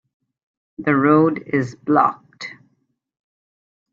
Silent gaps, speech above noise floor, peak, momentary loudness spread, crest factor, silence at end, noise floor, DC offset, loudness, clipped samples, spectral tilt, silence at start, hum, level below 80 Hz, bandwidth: none; 51 dB; -2 dBFS; 19 LU; 18 dB; 1.4 s; -68 dBFS; under 0.1%; -18 LUFS; under 0.1%; -8 dB/octave; 0.8 s; none; -64 dBFS; 7.2 kHz